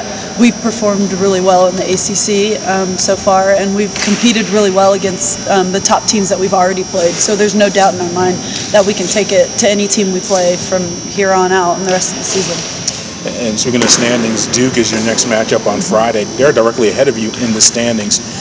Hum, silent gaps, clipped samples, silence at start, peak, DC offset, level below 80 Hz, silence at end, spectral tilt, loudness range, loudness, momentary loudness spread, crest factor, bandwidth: none; none; 0.4%; 0 s; 0 dBFS; under 0.1%; -42 dBFS; 0 s; -3 dB/octave; 1 LU; -11 LUFS; 5 LU; 12 dB; 8 kHz